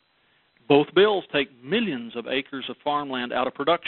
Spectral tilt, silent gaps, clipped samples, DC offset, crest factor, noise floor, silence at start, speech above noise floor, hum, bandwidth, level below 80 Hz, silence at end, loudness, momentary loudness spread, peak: -9 dB/octave; none; under 0.1%; under 0.1%; 22 dB; -65 dBFS; 0.7 s; 41 dB; none; 4.3 kHz; -64 dBFS; 0 s; -24 LUFS; 9 LU; -4 dBFS